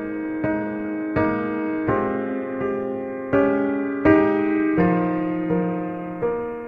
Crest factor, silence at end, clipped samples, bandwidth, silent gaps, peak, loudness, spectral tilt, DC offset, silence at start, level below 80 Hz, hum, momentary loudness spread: 18 dB; 0 s; under 0.1%; 4.8 kHz; none; -4 dBFS; -22 LUFS; -10 dB/octave; under 0.1%; 0 s; -50 dBFS; none; 9 LU